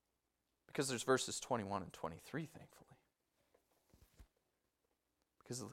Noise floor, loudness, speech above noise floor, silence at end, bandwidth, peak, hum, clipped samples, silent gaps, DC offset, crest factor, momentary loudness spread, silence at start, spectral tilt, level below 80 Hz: -87 dBFS; -42 LUFS; 45 dB; 0 s; 16 kHz; -20 dBFS; none; under 0.1%; none; under 0.1%; 26 dB; 13 LU; 0.75 s; -3.5 dB/octave; -76 dBFS